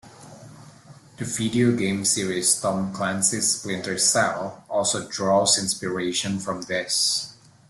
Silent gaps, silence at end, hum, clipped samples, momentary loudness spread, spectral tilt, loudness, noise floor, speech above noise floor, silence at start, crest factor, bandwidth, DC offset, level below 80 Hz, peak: none; 0.35 s; none; under 0.1%; 9 LU; -2.5 dB/octave; -22 LUFS; -48 dBFS; 24 dB; 0.05 s; 18 dB; 12.5 kHz; under 0.1%; -60 dBFS; -6 dBFS